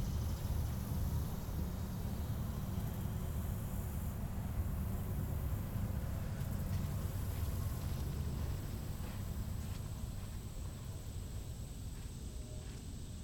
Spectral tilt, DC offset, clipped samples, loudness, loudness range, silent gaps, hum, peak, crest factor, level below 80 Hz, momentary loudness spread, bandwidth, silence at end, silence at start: -6.5 dB/octave; under 0.1%; under 0.1%; -42 LUFS; 5 LU; none; none; -26 dBFS; 12 dB; -44 dBFS; 8 LU; 19 kHz; 0 s; 0 s